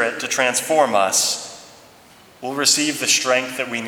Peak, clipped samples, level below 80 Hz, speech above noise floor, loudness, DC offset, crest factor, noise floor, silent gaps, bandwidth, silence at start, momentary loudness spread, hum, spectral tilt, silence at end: -2 dBFS; under 0.1%; -68 dBFS; 28 dB; -18 LUFS; under 0.1%; 18 dB; -48 dBFS; none; 20 kHz; 0 s; 11 LU; none; -1 dB/octave; 0 s